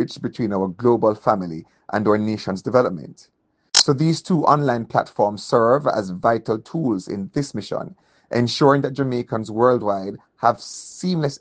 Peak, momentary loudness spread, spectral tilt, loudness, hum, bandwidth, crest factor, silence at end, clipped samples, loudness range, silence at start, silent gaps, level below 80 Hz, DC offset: 0 dBFS; 11 LU; -5 dB/octave; -20 LUFS; none; 10 kHz; 20 dB; 0.05 s; under 0.1%; 3 LU; 0 s; none; -60 dBFS; under 0.1%